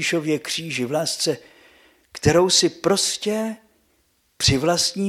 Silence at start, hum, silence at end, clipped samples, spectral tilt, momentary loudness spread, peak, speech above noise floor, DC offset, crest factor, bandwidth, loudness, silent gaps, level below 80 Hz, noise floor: 0 s; none; 0 s; under 0.1%; -3.5 dB/octave; 11 LU; -2 dBFS; 44 dB; under 0.1%; 20 dB; 15.5 kHz; -20 LUFS; none; -46 dBFS; -65 dBFS